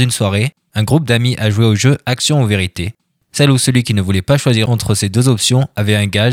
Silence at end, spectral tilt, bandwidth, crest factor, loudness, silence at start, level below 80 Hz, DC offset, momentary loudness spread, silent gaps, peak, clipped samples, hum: 0 s; -5 dB/octave; 16 kHz; 14 dB; -14 LUFS; 0 s; -42 dBFS; under 0.1%; 6 LU; none; 0 dBFS; under 0.1%; none